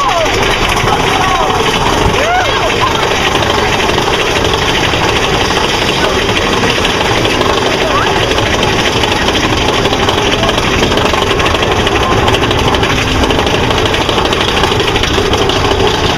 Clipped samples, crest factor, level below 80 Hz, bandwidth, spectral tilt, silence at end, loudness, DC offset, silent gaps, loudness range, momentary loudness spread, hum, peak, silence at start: under 0.1%; 10 dB; -24 dBFS; 16 kHz; -4 dB/octave; 0 s; -10 LUFS; under 0.1%; none; 0 LU; 1 LU; none; 0 dBFS; 0 s